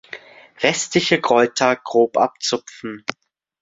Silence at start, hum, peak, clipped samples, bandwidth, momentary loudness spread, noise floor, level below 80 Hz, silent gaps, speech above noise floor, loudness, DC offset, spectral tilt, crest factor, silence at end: 0.15 s; none; 0 dBFS; under 0.1%; 8 kHz; 15 LU; -40 dBFS; -62 dBFS; none; 21 dB; -18 LUFS; under 0.1%; -3 dB/octave; 20 dB; 0.5 s